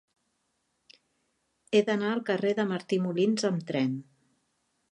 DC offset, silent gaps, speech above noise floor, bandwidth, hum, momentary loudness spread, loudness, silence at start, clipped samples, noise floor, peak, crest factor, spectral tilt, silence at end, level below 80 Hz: under 0.1%; none; 49 dB; 10.5 kHz; none; 4 LU; -28 LUFS; 1.7 s; under 0.1%; -77 dBFS; -12 dBFS; 18 dB; -6 dB/octave; 0.9 s; -80 dBFS